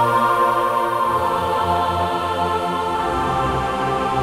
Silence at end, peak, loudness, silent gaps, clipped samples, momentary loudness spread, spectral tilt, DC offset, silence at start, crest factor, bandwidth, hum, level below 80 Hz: 0 s; -6 dBFS; -19 LUFS; none; under 0.1%; 4 LU; -5.5 dB/octave; under 0.1%; 0 s; 14 dB; 17 kHz; none; -42 dBFS